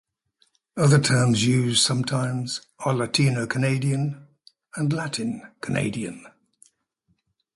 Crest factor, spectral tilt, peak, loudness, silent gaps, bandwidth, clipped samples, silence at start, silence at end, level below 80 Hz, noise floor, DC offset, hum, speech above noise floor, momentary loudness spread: 18 dB; -4.5 dB/octave; -6 dBFS; -23 LUFS; none; 11.5 kHz; under 0.1%; 0.75 s; 1.25 s; -58 dBFS; -71 dBFS; under 0.1%; none; 49 dB; 14 LU